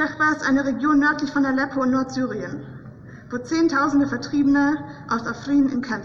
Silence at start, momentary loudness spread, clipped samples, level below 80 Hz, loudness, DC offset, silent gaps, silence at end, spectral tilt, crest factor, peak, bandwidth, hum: 0 s; 14 LU; under 0.1%; -52 dBFS; -21 LUFS; under 0.1%; none; 0 s; -5.5 dB/octave; 12 dB; -10 dBFS; 7.2 kHz; none